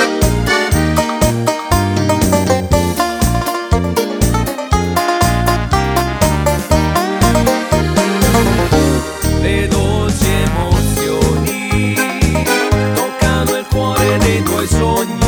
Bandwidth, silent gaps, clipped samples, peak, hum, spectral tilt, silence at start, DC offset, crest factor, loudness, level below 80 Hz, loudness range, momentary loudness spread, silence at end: over 20 kHz; none; under 0.1%; 0 dBFS; none; -5 dB/octave; 0 s; under 0.1%; 14 dB; -14 LUFS; -22 dBFS; 1 LU; 3 LU; 0 s